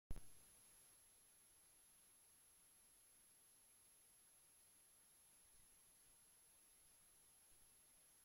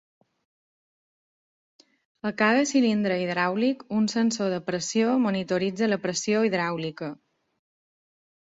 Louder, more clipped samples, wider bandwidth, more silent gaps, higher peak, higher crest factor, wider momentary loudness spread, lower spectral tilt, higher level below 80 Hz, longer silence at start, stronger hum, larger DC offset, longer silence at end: second, -68 LUFS vs -25 LUFS; neither; first, 16.5 kHz vs 7.8 kHz; neither; second, -36 dBFS vs -8 dBFS; first, 26 dB vs 20 dB; second, 2 LU vs 9 LU; second, -2.5 dB/octave vs -4.5 dB/octave; about the same, -70 dBFS vs -70 dBFS; second, 0.1 s vs 2.25 s; neither; neither; second, 0 s vs 1.3 s